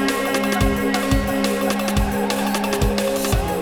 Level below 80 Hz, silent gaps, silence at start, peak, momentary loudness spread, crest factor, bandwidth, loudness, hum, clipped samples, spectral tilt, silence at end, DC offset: -28 dBFS; none; 0 s; -6 dBFS; 2 LU; 14 dB; 19.5 kHz; -20 LUFS; none; under 0.1%; -4.5 dB/octave; 0 s; under 0.1%